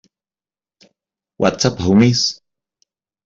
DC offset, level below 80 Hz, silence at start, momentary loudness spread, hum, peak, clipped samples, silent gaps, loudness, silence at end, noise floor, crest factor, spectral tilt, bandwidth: under 0.1%; -50 dBFS; 1.4 s; 8 LU; none; -2 dBFS; under 0.1%; none; -15 LUFS; 0.95 s; under -90 dBFS; 18 dB; -5 dB/octave; 7.8 kHz